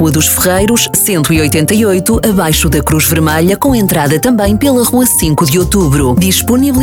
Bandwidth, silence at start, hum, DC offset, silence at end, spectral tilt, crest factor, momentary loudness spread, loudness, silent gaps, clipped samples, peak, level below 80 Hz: 19 kHz; 0 s; none; 0.2%; 0 s; -4.5 dB/octave; 10 dB; 2 LU; -9 LUFS; none; under 0.1%; 0 dBFS; -24 dBFS